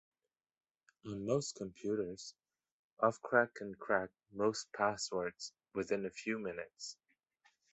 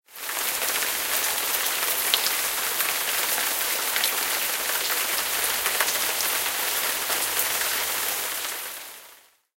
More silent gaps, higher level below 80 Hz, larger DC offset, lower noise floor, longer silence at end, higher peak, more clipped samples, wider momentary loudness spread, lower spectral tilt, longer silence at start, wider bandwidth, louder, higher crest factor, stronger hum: first, 2.72-2.97 s vs none; second, -74 dBFS vs -64 dBFS; neither; first, -75 dBFS vs -52 dBFS; first, 0.8 s vs 0.45 s; second, -14 dBFS vs 0 dBFS; neither; first, 15 LU vs 5 LU; first, -4 dB/octave vs 2 dB/octave; first, 1.05 s vs 0.1 s; second, 8.2 kHz vs 17 kHz; second, -38 LUFS vs -23 LUFS; about the same, 24 dB vs 26 dB; neither